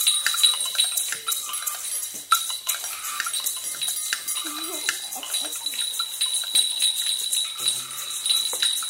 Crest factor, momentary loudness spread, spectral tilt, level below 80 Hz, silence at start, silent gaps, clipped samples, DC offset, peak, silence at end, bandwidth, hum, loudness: 24 dB; 8 LU; 3 dB/octave; -74 dBFS; 0 s; none; under 0.1%; under 0.1%; -2 dBFS; 0 s; 16.5 kHz; none; -23 LUFS